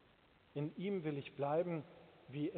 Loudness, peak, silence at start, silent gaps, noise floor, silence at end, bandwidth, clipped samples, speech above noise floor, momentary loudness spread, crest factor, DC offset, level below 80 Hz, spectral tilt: -42 LUFS; -26 dBFS; 0.55 s; none; -69 dBFS; 0 s; 4.5 kHz; under 0.1%; 28 dB; 14 LU; 16 dB; under 0.1%; -80 dBFS; -7 dB/octave